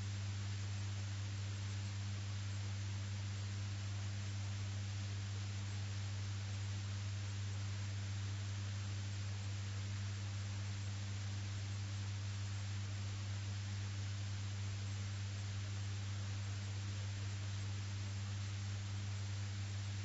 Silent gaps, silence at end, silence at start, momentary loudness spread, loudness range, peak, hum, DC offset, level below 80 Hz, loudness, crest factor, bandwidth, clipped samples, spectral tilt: none; 0 s; 0 s; 1 LU; 0 LU; -34 dBFS; none; under 0.1%; -64 dBFS; -44 LUFS; 8 dB; 7.6 kHz; under 0.1%; -5 dB/octave